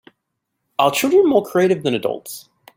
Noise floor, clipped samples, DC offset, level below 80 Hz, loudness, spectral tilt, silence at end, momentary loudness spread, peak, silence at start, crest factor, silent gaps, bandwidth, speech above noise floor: -76 dBFS; under 0.1%; under 0.1%; -64 dBFS; -17 LUFS; -4.5 dB/octave; 0.35 s; 16 LU; -2 dBFS; 0.8 s; 18 dB; none; 16.5 kHz; 59 dB